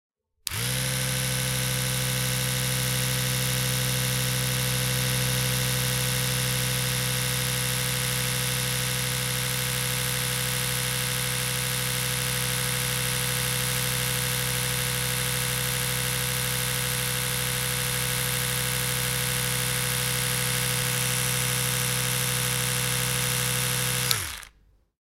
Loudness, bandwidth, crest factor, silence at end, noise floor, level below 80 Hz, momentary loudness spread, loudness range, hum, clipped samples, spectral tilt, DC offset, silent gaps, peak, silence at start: -25 LUFS; 17 kHz; 22 dB; 0.5 s; -60 dBFS; -44 dBFS; 1 LU; 1 LU; none; under 0.1%; -2.5 dB/octave; under 0.1%; none; -4 dBFS; 0.45 s